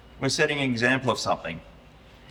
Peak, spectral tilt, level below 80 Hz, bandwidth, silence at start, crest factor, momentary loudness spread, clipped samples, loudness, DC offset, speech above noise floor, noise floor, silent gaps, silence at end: -6 dBFS; -4 dB/octave; -54 dBFS; 16.5 kHz; 0.05 s; 20 dB; 11 LU; under 0.1%; -24 LUFS; under 0.1%; 25 dB; -50 dBFS; none; 0 s